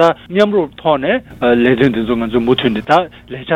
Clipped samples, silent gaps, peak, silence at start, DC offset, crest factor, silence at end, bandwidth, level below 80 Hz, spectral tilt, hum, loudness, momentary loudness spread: under 0.1%; none; 0 dBFS; 0 s; under 0.1%; 14 dB; 0 s; 10.5 kHz; -42 dBFS; -7 dB/octave; none; -14 LUFS; 5 LU